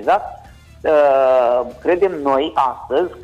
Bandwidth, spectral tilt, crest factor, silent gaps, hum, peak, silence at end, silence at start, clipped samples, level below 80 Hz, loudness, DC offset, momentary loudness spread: 9.6 kHz; -6 dB/octave; 12 dB; none; none; -6 dBFS; 0 s; 0 s; under 0.1%; -48 dBFS; -16 LUFS; under 0.1%; 7 LU